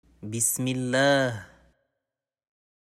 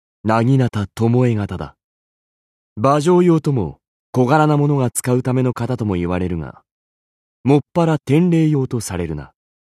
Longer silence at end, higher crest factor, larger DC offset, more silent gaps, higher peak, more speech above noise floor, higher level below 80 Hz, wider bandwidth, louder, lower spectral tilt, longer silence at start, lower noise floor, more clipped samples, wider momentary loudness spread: first, 1.35 s vs 0.35 s; about the same, 18 dB vs 16 dB; neither; second, none vs 1.84-2.76 s, 3.88-4.13 s, 6.71-7.44 s; second, -10 dBFS vs -2 dBFS; second, 64 dB vs over 74 dB; second, -64 dBFS vs -46 dBFS; first, 16 kHz vs 14 kHz; second, -24 LUFS vs -17 LUFS; second, -3.5 dB/octave vs -7 dB/octave; about the same, 0.2 s vs 0.25 s; about the same, -89 dBFS vs under -90 dBFS; neither; about the same, 13 LU vs 12 LU